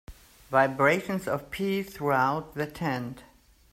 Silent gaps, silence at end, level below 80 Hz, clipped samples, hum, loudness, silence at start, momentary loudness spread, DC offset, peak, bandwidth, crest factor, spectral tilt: none; 0.5 s; -56 dBFS; under 0.1%; none; -27 LUFS; 0.1 s; 11 LU; under 0.1%; -10 dBFS; 16 kHz; 20 dB; -6 dB/octave